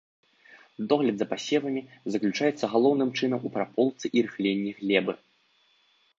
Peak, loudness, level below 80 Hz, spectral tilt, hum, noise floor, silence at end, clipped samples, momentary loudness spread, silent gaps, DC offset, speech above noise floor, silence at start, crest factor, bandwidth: -6 dBFS; -27 LUFS; -74 dBFS; -5.5 dB/octave; none; -66 dBFS; 1.05 s; under 0.1%; 9 LU; none; under 0.1%; 40 dB; 0.55 s; 22 dB; 7.6 kHz